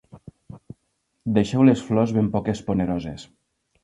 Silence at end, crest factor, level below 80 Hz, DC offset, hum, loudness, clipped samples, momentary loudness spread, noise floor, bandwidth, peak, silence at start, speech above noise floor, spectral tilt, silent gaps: 0.6 s; 20 dB; -48 dBFS; under 0.1%; none; -22 LUFS; under 0.1%; 21 LU; -73 dBFS; 10.5 kHz; -4 dBFS; 0.15 s; 52 dB; -7.5 dB/octave; none